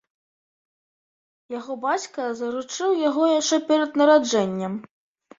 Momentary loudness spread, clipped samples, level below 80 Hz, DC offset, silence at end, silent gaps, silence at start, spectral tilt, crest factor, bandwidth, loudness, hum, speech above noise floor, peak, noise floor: 15 LU; under 0.1%; -70 dBFS; under 0.1%; 0.55 s; none; 1.5 s; -4 dB/octave; 20 dB; 7.8 kHz; -22 LUFS; none; over 68 dB; -4 dBFS; under -90 dBFS